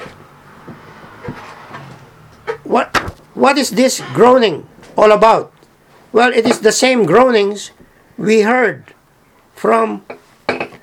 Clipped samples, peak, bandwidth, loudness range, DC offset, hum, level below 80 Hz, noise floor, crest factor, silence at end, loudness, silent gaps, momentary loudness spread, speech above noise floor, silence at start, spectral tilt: 0.1%; 0 dBFS; 16.5 kHz; 7 LU; under 0.1%; none; -50 dBFS; -51 dBFS; 14 dB; 0.05 s; -13 LUFS; none; 22 LU; 39 dB; 0 s; -4 dB/octave